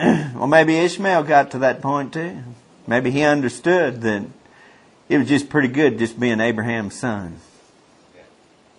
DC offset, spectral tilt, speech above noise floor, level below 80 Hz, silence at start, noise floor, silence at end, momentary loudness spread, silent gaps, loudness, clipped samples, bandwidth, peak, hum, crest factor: under 0.1%; -6 dB/octave; 35 dB; -56 dBFS; 0 s; -53 dBFS; 1.4 s; 12 LU; none; -19 LUFS; under 0.1%; 11 kHz; 0 dBFS; none; 20 dB